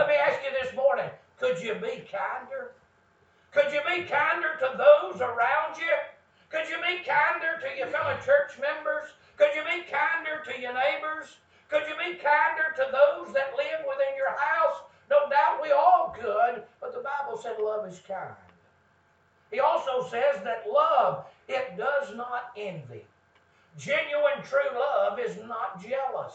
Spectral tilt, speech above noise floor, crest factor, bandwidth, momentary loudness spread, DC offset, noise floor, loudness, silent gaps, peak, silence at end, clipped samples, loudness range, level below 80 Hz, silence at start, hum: -4 dB/octave; 38 dB; 22 dB; 8 kHz; 13 LU; under 0.1%; -64 dBFS; -27 LUFS; none; -6 dBFS; 0 s; under 0.1%; 6 LU; -74 dBFS; 0 s; none